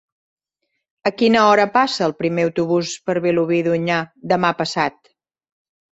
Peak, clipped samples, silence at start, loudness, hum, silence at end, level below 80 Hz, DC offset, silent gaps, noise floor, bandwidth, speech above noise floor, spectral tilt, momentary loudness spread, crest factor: -2 dBFS; under 0.1%; 1.05 s; -18 LUFS; none; 1.05 s; -62 dBFS; under 0.1%; none; -75 dBFS; 8.2 kHz; 58 dB; -5 dB/octave; 9 LU; 18 dB